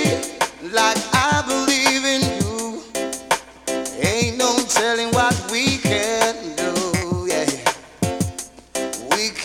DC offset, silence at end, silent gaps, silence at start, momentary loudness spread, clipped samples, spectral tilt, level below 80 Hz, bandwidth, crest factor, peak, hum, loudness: under 0.1%; 0 s; none; 0 s; 9 LU; under 0.1%; -3 dB/octave; -46 dBFS; 19 kHz; 20 dB; 0 dBFS; none; -20 LUFS